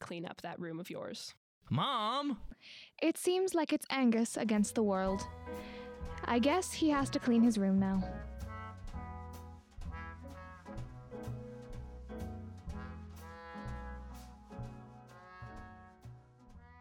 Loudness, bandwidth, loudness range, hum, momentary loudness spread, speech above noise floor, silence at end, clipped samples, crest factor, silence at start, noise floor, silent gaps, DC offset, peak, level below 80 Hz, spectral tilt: -35 LUFS; 17 kHz; 15 LU; none; 20 LU; 24 dB; 0 s; under 0.1%; 18 dB; 0 s; -57 dBFS; 1.37-1.61 s; under 0.1%; -20 dBFS; -54 dBFS; -5.5 dB/octave